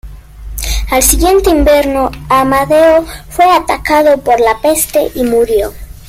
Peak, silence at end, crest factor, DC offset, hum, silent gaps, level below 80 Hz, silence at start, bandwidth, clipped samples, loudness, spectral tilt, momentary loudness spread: 0 dBFS; 0.15 s; 10 dB; under 0.1%; none; none; -24 dBFS; 0.05 s; 16.5 kHz; under 0.1%; -10 LUFS; -3.5 dB/octave; 9 LU